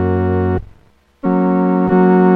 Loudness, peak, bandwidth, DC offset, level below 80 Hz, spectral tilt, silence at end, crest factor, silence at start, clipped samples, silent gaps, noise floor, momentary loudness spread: -15 LUFS; -2 dBFS; 3.9 kHz; under 0.1%; -40 dBFS; -11.5 dB/octave; 0 s; 12 dB; 0 s; under 0.1%; none; -50 dBFS; 10 LU